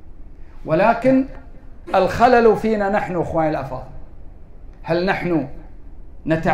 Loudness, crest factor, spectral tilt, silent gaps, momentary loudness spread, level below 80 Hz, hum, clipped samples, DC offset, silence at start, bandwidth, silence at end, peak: -18 LUFS; 16 dB; -7.5 dB/octave; none; 18 LU; -38 dBFS; none; under 0.1%; under 0.1%; 0 s; 15 kHz; 0 s; -4 dBFS